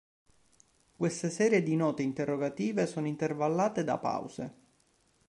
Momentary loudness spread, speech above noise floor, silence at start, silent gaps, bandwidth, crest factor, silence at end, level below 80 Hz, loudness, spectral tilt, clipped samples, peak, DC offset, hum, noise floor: 8 LU; 39 dB; 1 s; none; 11.5 kHz; 18 dB; 0.75 s; -72 dBFS; -31 LUFS; -6 dB/octave; under 0.1%; -14 dBFS; under 0.1%; none; -70 dBFS